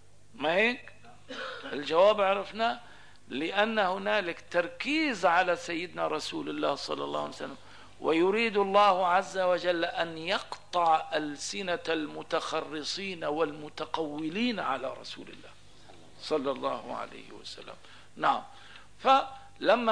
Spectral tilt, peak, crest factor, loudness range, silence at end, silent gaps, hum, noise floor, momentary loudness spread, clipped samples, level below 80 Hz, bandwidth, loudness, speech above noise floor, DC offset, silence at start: -4 dB/octave; -10 dBFS; 20 dB; 7 LU; 0 s; none; 50 Hz at -65 dBFS; -55 dBFS; 16 LU; under 0.1%; -66 dBFS; 11 kHz; -29 LUFS; 26 dB; 0.3%; 0.35 s